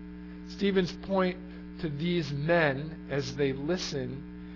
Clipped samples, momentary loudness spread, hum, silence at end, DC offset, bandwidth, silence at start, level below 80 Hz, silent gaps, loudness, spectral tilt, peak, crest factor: under 0.1%; 16 LU; none; 0 s; under 0.1%; 6 kHz; 0 s; -50 dBFS; none; -30 LUFS; -6 dB/octave; -12 dBFS; 18 dB